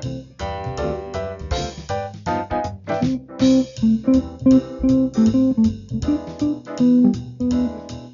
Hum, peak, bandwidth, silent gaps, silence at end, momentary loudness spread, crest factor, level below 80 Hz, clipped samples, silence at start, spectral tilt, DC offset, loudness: none; -6 dBFS; 7.4 kHz; none; 0 s; 11 LU; 14 dB; -38 dBFS; under 0.1%; 0 s; -7 dB/octave; under 0.1%; -20 LUFS